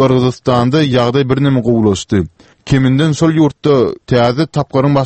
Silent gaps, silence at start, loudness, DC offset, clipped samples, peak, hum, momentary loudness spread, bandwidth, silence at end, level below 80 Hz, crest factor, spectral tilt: none; 0 s; -13 LUFS; under 0.1%; under 0.1%; 0 dBFS; none; 4 LU; 8.6 kHz; 0 s; -40 dBFS; 12 dB; -7 dB/octave